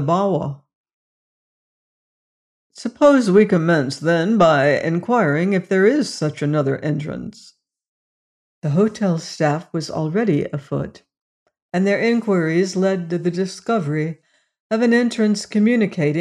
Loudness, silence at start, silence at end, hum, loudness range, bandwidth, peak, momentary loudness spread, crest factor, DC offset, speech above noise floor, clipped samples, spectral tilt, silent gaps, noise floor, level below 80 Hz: -18 LUFS; 0 s; 0 s; none; 6 LU; 11 kHz; -4 dBFS; 12 LU; 16 dB; under 0.1%; over 72 dB; under 0.1%; -6.5 dB/octave; 0.75-0.84 s, 0.94-2.70 s, 7.88-8.62 s, 11.21-11.46 s, 11.62-11.69 s, 14.60-14.70 s; under -90 dBFS; -60 dBFS